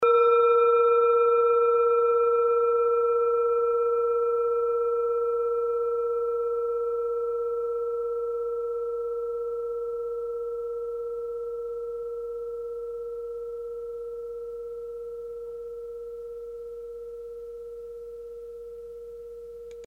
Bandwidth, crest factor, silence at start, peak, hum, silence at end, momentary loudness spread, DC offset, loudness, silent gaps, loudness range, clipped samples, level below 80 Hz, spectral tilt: 3.9 kHz; 16 dB; 0 s; -12 dBFS; none; 0 s; 19 LU; under 0.1%; -26 LUFS; none; 16 LU; under 0.1%; -60 dBFS; -5 dB/octave